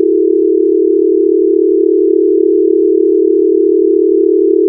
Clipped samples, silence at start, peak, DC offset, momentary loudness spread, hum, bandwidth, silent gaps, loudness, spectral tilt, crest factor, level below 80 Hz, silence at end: under 0.1%; 0 s; 0 dBFS; under 0.1%; 1 LU; none; 0.5 kHz; none; -10 LUFS; -14.5 dB/octave; 8 dB; -86 dBFS; 0 s